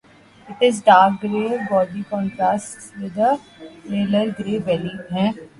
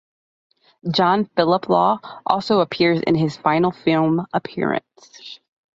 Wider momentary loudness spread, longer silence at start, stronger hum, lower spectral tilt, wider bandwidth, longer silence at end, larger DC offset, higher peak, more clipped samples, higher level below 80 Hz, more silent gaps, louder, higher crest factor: first, 15 LU vs 11 LU; second, 0.45 s vs 0.85 s; neither; second, -5.5 dB/octave vs -7 dB/octave; first, 11.5 kHz vs 7.6 kHz; second, 0.15 s vs 0.4 s; neither; about the same, 0 dBFS vs -2 dBFS; neither; about the same, -58 dBFS vs -60 dBFS; neither; about the same, -20 LUFS vs -19 LUFS; about the same, 20 dB vs 18 dB